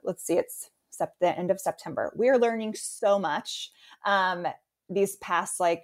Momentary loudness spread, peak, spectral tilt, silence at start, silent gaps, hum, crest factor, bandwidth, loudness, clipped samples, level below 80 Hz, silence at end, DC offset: 12 LU; -12 dBFS; -3.5 dB/octave; 0.05 s; none; none; 16 dB; 16 kHz; -28 LUFS; under 0.1%; -74 dBFS; 0.05 s; under 0.1%